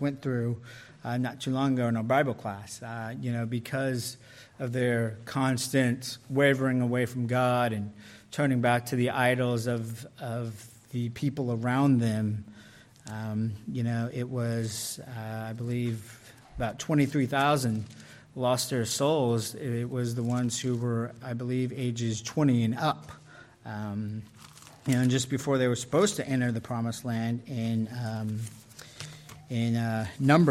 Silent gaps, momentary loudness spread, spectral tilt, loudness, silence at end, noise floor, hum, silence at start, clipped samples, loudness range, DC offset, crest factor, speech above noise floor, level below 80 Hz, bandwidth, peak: none; 15 LU; -5.5 dB/octave; -29 LUFS; 0 s; -53 dBFS; none; 0 s; under 0.1%; 5 LU; under 0.1%; 20 dB; 24 dB; -62 dBFS; 15.5 kHz; -8 dBFS